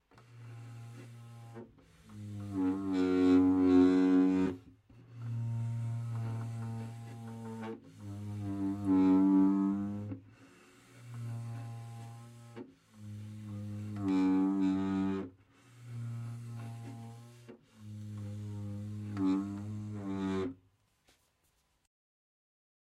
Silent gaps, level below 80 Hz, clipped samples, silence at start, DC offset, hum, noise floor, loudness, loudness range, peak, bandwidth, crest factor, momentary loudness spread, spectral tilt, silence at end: none; -70 dBFS; under 0.1%; 0.3 s; under 0.1%; none; -75 dBFS; -33 LUFS; 16 LU; -16 dBFS; 9.2 kHz; 18 dB; 24 LU; -8.5 dB/octave; 2.3 s